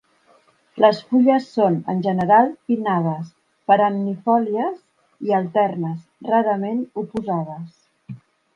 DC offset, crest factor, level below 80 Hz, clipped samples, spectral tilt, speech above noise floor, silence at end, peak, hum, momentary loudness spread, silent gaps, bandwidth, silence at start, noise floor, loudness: under 0.1%; 20 dB; -64 dBFS; under 0.1%; -8.5 dB/octave; 38 dB; 0.4 s; -2 dBFS; none; 21 LU; none; 7.4 kHz; 0.75 s; -57 dBFS; -20 LUFS